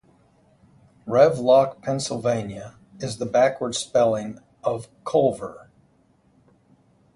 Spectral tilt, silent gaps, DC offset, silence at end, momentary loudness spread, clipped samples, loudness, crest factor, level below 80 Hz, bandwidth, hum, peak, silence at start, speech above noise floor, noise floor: -5 dB/octave; none; under 0.1%; 1.6 s; 18 LU; under 0.1%; -22 LUFS; 20 dB; -60 dBFS; 11.5 kHz; none; -4 dBFS; 1.05 s; 39 dB; -61 dBFS